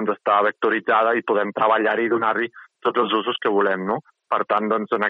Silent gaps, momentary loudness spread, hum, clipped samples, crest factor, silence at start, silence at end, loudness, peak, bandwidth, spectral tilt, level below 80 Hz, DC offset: none; 7 LU; none; under 0.1%; 14 dB; 0 s; 0 s; -21 LUFS; -6 dBFS; 5.2 kHz; -7.5 dB/octave; -72 dBFS; under 0.1%